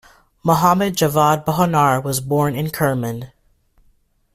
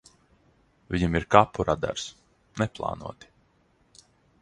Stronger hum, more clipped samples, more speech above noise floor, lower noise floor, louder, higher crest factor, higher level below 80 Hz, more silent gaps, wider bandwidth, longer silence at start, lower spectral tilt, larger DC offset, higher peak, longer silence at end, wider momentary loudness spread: neither; neither; about the same, 41 dB vs 40 dB; second, -58 dBFS vs -65 dBFS; first, -17 LUFS vs -26 LUFS; second, 16 dB vs 28 dB; about the same, -50 dBFS vs -46 dBFS; neither; first, 16 kHz vs 11 kHz; second, 0.45 s vs 0.9 s; about the same, -5.5 dB/octave vs -5.5 dB/octave; neither; about the same, -2 dBFS vs 0 dBFS; second, 1.1 s vs 1.3 s; second, 10 LU vs 19 LU